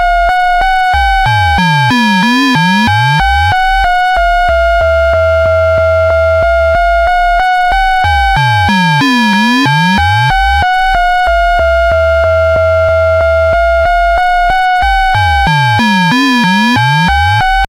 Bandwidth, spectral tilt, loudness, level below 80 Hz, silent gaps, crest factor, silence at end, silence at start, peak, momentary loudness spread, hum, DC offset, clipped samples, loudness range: 16 kHz; -5.5 dB/octave; -9 LUFS; -20 dBFS; none; 6 dB; 0.05 s; 0 s; -2 dBFS; 1 LU; none; under 0.1%; under 0.1%; 1 LU